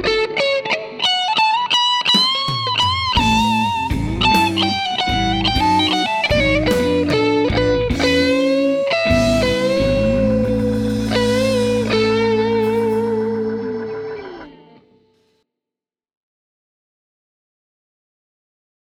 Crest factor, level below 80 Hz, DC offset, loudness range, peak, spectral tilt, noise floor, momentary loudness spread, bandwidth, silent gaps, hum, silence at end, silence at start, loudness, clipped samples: 16 dB; -34 dBFS; under 0.1%; 7 LU; -2 dBFS; -5 dB/octave; -88 dBFS; 6 LU; 17 kHz; none; none; 4.4 s; 0 s; -16 LUFS; under 0.1%